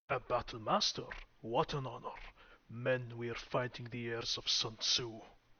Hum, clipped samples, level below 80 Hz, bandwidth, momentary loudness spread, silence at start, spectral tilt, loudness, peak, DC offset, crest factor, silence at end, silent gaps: none; under 0.1%; -60 dBFS; 7 kHz; 16 LU; 0.1 s; -3 dB/octave; -37 LUFS; -18 dBFS; under 0.1%; 20 dB; 0.05 s; none